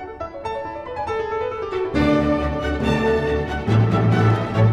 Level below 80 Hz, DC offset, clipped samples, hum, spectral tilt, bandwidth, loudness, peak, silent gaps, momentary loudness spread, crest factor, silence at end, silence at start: -34 dBFS; under 0.1%; under 0.1%; none; -8 dB/octave; 8.4 kHz; -21 LUFS; -6 dBFS; none; 11 LU; 14 dB; 0 s; 0 s